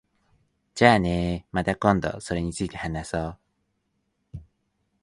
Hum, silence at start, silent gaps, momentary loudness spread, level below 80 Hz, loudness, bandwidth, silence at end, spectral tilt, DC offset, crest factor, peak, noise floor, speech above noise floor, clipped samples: none; 0.75 s; none; 25 LU; -44 dBFS; -24 LUFS; 11.5 kHz; 0.6 s; -6 dB/octave; under 0.1%; 26 dB; -2 dBFS; -74 dBFS; 51 dB; under 0.1%